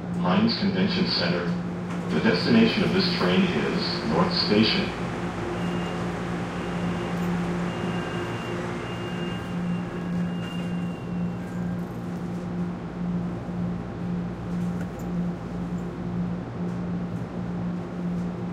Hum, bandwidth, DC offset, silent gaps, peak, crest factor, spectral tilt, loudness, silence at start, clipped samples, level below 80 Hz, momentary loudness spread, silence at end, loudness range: none; 10 kHz; under 0.1%; none; -8 dBFS; 18 dB; -6.5 dB/octave; -27 LUFS; 0 s; under 0.1%; -48 dBFS; 9 LU; 0 s; 8 LU